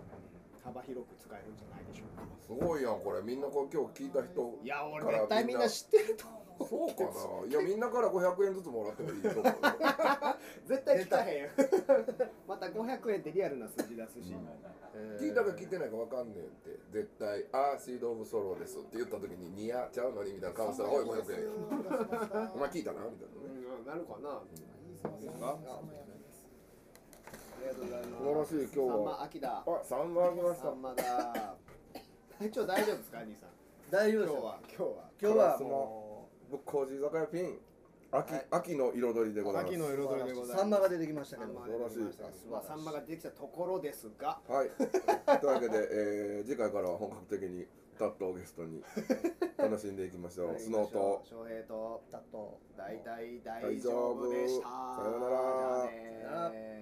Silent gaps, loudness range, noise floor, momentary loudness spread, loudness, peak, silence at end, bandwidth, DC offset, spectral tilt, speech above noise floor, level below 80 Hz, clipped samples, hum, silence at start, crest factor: none; 8 LU; -59 dBFS; 17 LU; -35 LUFS; -14 dBFS; 0 s; 15.5 kHz; under 0.1%; -5 dB/octave; 24 dB; -70 dBFS; under 0.1%; none; 0 s; 22 dB